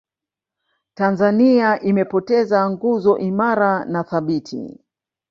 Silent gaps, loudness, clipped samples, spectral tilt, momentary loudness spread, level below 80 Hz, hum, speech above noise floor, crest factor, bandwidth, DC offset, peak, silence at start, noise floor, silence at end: none; -18 LUFS; under 0.1%; -8 dB/octave; 9 LU; -62 dBFS; none; 70 dB; 16 dB; 7 kHz; under 0.1%; -2 dBFS; 1 s; -87 dBFS; 0.6 s